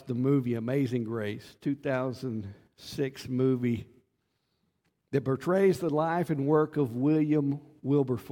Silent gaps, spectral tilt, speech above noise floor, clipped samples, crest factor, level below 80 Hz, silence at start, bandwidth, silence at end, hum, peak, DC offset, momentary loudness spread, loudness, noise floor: none; -8 dB/octave; 49 dB; under 0.1%; 16 dB; -66 dBFS; 0 s; 17 kHz; 0 s; none; -12 dBFS; under 0.1%; 11 LU; -29 LUFS; -77 dBFS